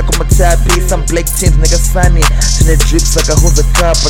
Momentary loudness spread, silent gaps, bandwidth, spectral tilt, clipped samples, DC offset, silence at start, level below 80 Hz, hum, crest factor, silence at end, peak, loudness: 2 LU; none; 17 kHz; -4 dB/octave; 1%; 0.6%; 0 s; -10 dBFS; none; 8 dB; 0 s; 0 dBFS; -10 LUFS